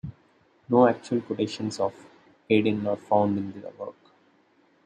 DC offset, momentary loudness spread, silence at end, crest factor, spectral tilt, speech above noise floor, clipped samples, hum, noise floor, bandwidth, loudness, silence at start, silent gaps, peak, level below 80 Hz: under 0.1%; 18 LU; 0.95 s; 22 dB; -6.5 dB/octave; 38 dB; under 0.1%; none; -63 dBFS; 9.8 kHz; -25 LUFS; 0.05 s; none; -6 dBFS; -64 dBFS